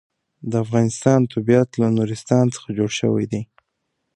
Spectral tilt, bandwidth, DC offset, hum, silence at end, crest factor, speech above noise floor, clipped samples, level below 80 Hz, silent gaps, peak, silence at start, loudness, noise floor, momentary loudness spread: -6.5 dB/octave; 11 kHz; under 0.1%; none; 0.7 s; 18 dB; 56 dB; under 0.1%; -56 dBFS; none; -2 dBFS; 0.45 s; -20 LUFS; -75 dBFS; 9 LU